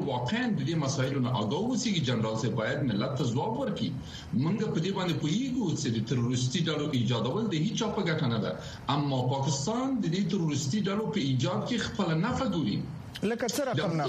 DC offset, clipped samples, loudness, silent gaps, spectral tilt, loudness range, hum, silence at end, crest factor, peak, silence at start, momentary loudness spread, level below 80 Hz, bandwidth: under 0.1%; under 0.1%; -30 LUFS; none; -5.5 dB/octave; 1 LU; none; 0 s; 16 dB; -14 dBFS; 0 s; 3 LU; -56 dBFS; 14 kHz